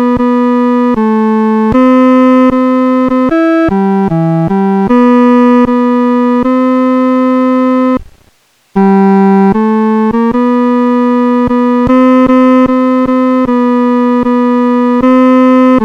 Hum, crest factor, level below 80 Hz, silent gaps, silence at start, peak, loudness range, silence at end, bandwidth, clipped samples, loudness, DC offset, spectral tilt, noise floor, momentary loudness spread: none; 8 dB; -38 dBFS; none; 0 s; 0 dBFS; 1 LU; 0 s; 6.2 kHz; 0.6%; -8 LUFS; under 0.1%; -8.5 dB/octave; -50 dBFS; 4 LU